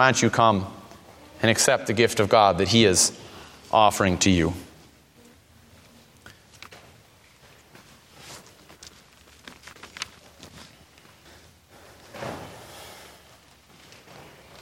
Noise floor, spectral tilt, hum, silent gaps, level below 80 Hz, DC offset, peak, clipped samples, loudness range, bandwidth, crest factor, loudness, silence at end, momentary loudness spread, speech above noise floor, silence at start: -55 dBFS; -3.5 dB/octave; none; none; -54 dBFS; under 0.1%; -2 dBFS; under 0.1%; 23 LU; 16.5 kHz; 24 dB; -20 LUFS; 1.65 s; 26 LU; 35 dB; 0 s